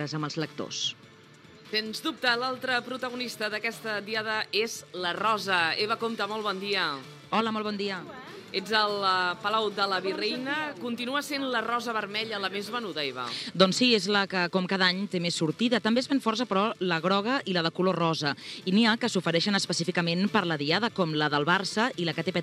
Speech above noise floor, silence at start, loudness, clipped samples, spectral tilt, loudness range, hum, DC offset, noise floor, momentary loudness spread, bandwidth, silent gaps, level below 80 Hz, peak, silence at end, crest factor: 25 dB; 0 s; -27 LUFS; under 0.1%; -4 dB/octave; 5 LU; none; under 0.1%; -52 dBFS; 8 LU; 15.5 kHz; none; -76 dBFS; -4 dBFS; 0 s; 24 dB